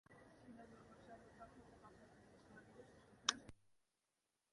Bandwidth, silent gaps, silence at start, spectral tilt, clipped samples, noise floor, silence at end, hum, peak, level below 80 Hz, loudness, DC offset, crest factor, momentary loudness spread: 11 kHz; none; 0.1 s; -1 dB/octave; under 0.1%; -90 dBFS; 0.75 s; none; -14 dBFS; -78 dBFS; -46 LUFS; under 0.1%; 42 dB; 23 LU